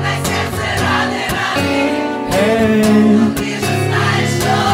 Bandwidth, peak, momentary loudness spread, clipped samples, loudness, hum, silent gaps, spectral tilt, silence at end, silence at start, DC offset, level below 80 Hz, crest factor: 16.5 kHz; -2 dBFS; 7 LU; under 0.1%; -14 LUFS; none; none; -5 dB/octave; 0 s; 0 s; under 0.1%; -38 dBFS; 12 dB